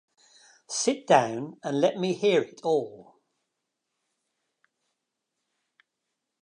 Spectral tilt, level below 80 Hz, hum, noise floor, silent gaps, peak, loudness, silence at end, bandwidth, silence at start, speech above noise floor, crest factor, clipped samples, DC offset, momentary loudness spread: -4 dB/octave; -82 dBFS; none; -83 dBFS; none; -6 dBFS; -26 LUFS; 3.4 s; 11 kHz; 0.7 s; 58 dB; 24 dB; under 0.1%; under 0.1%; 11 LU